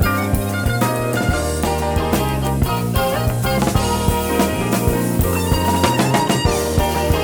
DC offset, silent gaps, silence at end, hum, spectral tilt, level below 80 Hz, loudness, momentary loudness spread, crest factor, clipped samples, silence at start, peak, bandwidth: under 0.1%; none; 0 s; none; -5 dB/octave; -26 dBFS; -18 LUFS; 3 LU; 16 dB; under 0.1%; 0 s; -2 dBFS; over 20 kHz